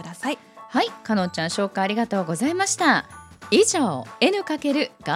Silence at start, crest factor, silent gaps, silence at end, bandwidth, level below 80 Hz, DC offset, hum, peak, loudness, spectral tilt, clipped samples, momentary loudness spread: 0 s; 18 dB; none; 0 s; 16 kHz; -62 dBFS; under 0.1%; none; -4 dBFS; -22 LUFS; -3.5 dB/octave; under 0.1%; 10 LU